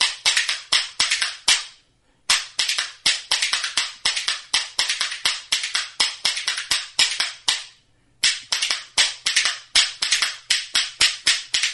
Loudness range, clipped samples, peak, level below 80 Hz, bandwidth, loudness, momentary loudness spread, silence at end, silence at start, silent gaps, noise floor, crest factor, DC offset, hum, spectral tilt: 2 LU; under 0.1%; -2 dBFS; -58 dBFS; 12 kHz; -20 LUFS; 4 LU; 0 s; 0 s; none; -61 dBFS; 22 dB; under 0.1%; none; 3 dB/octave